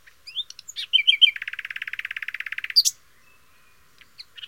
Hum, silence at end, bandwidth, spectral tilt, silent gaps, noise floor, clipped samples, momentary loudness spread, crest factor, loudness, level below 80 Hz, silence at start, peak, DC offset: none; 0 s; 17 kHz; 5.5 dB/octave; none; -59 dBFS; under 0.1%; 16 LU; 22 dB; -21 LUFS; -72 dBFS; 0.25 s; -4 dBFS; 0.2%